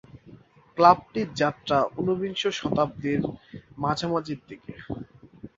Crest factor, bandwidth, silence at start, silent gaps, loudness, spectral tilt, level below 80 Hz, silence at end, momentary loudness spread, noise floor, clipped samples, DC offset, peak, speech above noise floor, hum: 24 dB; 7.8 kHz; 0.15 s; none; -25 LUFS; -6 dB/octave; -56 dBFS; 0.1 s; 21 LU; -51 dBFS; under 0.1%; under 0.1%; -2 dBFS; 26 dB; none